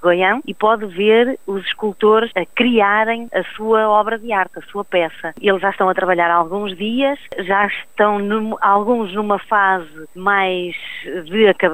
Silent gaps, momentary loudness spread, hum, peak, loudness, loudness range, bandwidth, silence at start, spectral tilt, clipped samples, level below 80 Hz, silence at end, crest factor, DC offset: none; 9 LU; none; -2 dBFS; -17 LUFS; 2 LU; 15.5 kHz; 0 s; -6 dB/octave; under 0.1%; -56 dBFS; 0 s; 14 dB; 0.8%